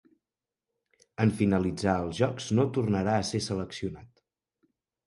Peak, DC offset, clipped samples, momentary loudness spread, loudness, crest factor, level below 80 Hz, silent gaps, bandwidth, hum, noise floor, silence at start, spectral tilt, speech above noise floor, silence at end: -10 dBFS; under 0.1%; under 0.1%; 11 LU; -28 LUFS; 20 dB; -52 dBFS; none; 11.5 kHz; none; under -90 dBFS; 1.2 s; -6 dB/octave; over 63 dB; 1 s